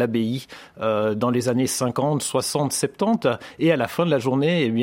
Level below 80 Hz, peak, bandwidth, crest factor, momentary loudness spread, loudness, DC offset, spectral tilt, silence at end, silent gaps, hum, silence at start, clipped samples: -62 dBFS; -4 dBFS; 16.5 kHz; 16 dB; 4 LU; -22 LUFS; under 0.1%; -5 dB/octave; 0 s; none; none; 0 s; under 0.1%